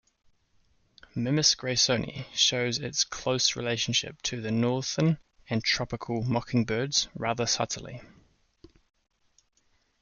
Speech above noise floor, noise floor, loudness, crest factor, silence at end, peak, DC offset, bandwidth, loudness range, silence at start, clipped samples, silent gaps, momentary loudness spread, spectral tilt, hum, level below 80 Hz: 41 dB; -69 dBFS; -27 LUFS; 22 dB; 1.95 s; -8 dBFS; under 0.1%; 10 kHz; 5 LU; 1.15 s; under 0.1%; none; 10 LU; -3.5 dB/octave; none; -58 dBFS